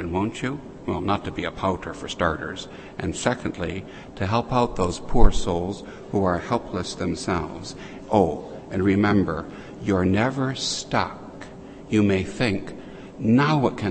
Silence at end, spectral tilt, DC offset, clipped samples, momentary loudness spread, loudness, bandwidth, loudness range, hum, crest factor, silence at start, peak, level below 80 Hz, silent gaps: 0 s; -6 dB/octave; under 0.1%; under 0.1%; 15 LU; -24 LUFS; 8.8 kHz; 4 LU; none; 22 dB; 0 s; 0 dBFS; -32 dBFS; none